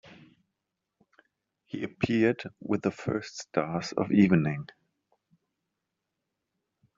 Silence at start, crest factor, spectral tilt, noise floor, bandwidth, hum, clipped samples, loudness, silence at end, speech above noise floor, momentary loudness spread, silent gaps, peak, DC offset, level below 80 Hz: 0.05 s; 22 dB; -6.5 dB/octave; -85 dBFS; 7.6 kHz; none; under 0.1%; -28 LUFS; 2.35 s; 57 dB; 15 LU; none; -8 dBFS; under 0.1%; -66 dBFS